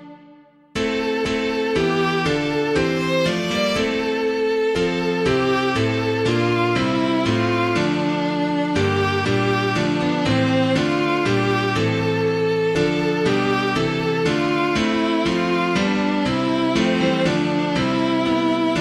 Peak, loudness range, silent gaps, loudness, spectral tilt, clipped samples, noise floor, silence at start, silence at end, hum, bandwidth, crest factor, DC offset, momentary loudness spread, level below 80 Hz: -6 dBFS; 1 LU; none; -20 LUFS; -6 dB/octave; under 0.1%; -49 dBFS; 0 s; 0 s; none; 14 kHz; 14 dB; under 0.1%; 2 LU; -46 dBFS